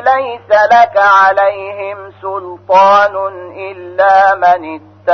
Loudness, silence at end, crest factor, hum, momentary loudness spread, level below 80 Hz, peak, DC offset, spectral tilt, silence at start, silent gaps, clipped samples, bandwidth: -9 LUFS; 0 s; 10 dB; none; 17 LU; -56 dBFS; 0 dBFS; under 0.1%; -4 dB/octave; 0 s; none; under 0.1%; 6.4 kHz